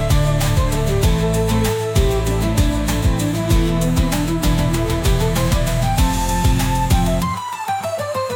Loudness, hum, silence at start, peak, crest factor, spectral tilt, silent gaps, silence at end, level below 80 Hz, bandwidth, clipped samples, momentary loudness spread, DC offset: -18 LUFS; none; 0 s; -4 dBFS; 12 dB; -5.5 dB/octave; none; 0 s; -22 dBFS; 19 kHz; under 0.1%; 4 LU; under 0.1%